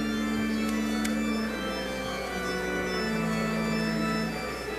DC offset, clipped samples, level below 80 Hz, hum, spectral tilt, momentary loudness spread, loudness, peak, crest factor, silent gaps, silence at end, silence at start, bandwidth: under 0.1%; under 0.1%; -46 dBFS; none; -5 dB/octave; 4 LU; -29 LUFS; -14 dBFS; 14 dB; none; 0 s; 0 s; 15.5 kHz